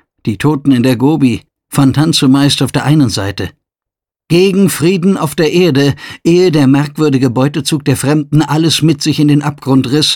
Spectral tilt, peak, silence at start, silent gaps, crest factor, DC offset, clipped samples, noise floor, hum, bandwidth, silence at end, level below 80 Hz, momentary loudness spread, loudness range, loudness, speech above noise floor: -5.5 dB/octave; 0 dBFS; 0.25 s; none; 10 dB; under 0.1%; under 0.1%; -84 dBFS; none; 18.5 kHz; 0 s; -44 dBFS; 6 LU; 2 LU; -11 LUFS; 74 dB